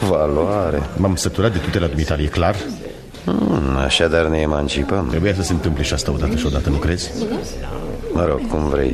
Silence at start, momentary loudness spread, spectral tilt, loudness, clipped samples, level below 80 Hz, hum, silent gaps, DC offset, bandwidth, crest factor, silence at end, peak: 0 s; 9 LU; -5.5 dB/octave; -19 LUFS; under 0.1%; -28 dBFS; none; none; under 0.1%; 13.5 kHz; 16 dB; 0 s; -2 dBFS